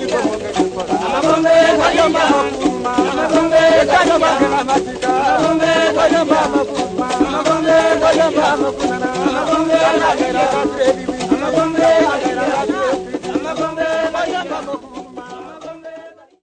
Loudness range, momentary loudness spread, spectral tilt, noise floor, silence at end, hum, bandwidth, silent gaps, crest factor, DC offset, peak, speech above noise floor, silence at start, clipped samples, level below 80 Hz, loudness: 6 LU; 10 LU; -4 dB/octave; -37 dBFS; 0.35 s; none; 9.6 kHz; none; 14 dB; under 0.1%; 0 dBFS; 21 dB; 0 s; under 0.1%; -44 dBFS; -15 LUFS